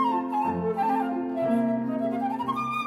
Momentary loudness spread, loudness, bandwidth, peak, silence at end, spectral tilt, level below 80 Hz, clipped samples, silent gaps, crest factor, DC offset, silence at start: 3 LU; -27 LUFS; 13 kHz; -14 dBFS; 0 s; -7.5 dB/octave; -64 dBFS; under 0.1%; none; 12 dB; under 0.1%; 0 s